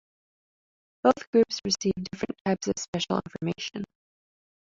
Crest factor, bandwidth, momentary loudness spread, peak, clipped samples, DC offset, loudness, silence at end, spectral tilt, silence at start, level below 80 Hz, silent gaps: 22 dB; 7.8 kHz; 10 LU; -6 dBFS; under 0.1%; under 0.1%; -28 LUFS; 0.8 s; -4.5 dB/octave; 1.05 s; -60 dBFS; 1.27-1.33 s, 2.41-2.45 s, 2.88-2.93 s